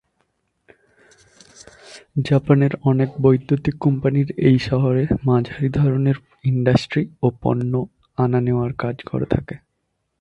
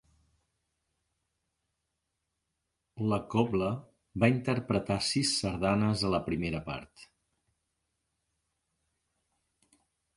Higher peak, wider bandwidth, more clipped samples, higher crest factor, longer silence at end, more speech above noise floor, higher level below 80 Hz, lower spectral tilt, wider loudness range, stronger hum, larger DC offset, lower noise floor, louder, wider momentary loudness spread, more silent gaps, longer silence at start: first, -2 dBFS vs -10 dBFS; second, 8.4 kHz vs 11.5 kHz; neither; second, 18 dB vs 24 dB; second, 0.65 s vs 3.1 s; about the same, 55 dB vs 54 dB; first, -44 dBFS vs -56 dBFS; first, -8.5 dB/octave vs -5 dB/octave; second, 4 LU vs 12 LU; neither; neither; second, -73 dBFS vs -84 dBFS; first, -20 LUFS vs -30 LUFS; about the same, 9 LU vs 10 LU; neither; second, 1.85 s vs 2.95 s